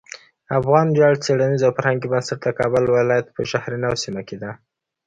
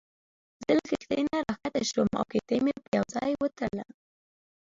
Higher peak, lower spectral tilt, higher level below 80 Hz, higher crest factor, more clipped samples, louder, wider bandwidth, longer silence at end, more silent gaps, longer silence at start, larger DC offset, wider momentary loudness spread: first, -2 dBFS vs -12 dBFS; about the same, -6 dB/octave vs -5 dB/octave; first, -54 dBFS vs -60 dBFS; about the same, 18 dB vs 18 dB; neither; first, -19 LUFS vs -29 LUFS; first, 9.2 kHz vs 7.8 kHz; second, 0.5 s vs 0.85 s; second, none vs 2.88-2.92 s; about the same, 0.5 s vs 0.6 s; neither; first, 15 LU vs 7 LU